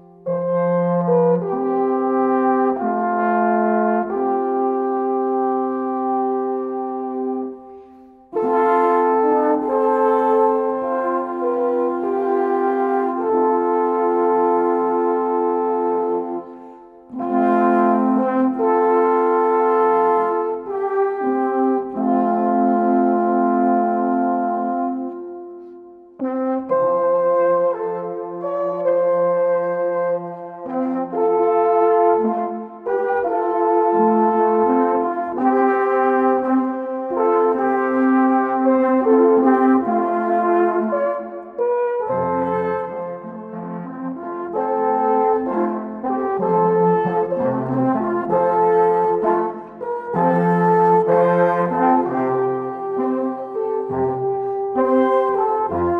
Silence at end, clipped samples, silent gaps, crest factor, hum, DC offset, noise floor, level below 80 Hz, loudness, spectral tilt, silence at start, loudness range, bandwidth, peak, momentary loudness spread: 0 s; under 0.1%; none; 14 dB; none; under 0.1%; -45 dBFS; -62 dBFS; -19 LUFS; -10 dB/octave; 0.25 s; 4 LU; 3.9 kHz; -4 dBFS; 9 LU